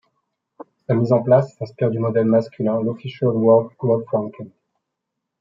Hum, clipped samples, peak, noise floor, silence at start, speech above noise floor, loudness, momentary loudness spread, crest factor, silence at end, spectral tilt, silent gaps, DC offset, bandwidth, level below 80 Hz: none; under 0.1%; -2 dBFS; -80 dBFS; 0.9 s; 62 dB; -19 LUFS; 14 LU; 18 dB; 0.9 s; -10 dB/octave; none; under 0.1%; 7.4 kHz; -66 dBFS